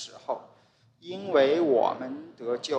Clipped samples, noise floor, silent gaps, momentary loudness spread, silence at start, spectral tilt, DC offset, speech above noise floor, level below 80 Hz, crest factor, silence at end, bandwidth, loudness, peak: under 0.1%; -62 dBFS; none; 16 LU; 0 s; -4.5 dB/octave; under 0.1%; 35 dB; -80 dBFS; 18 dB; 0 s; 9.2 kHz; -27 LUFS; -10 dBFS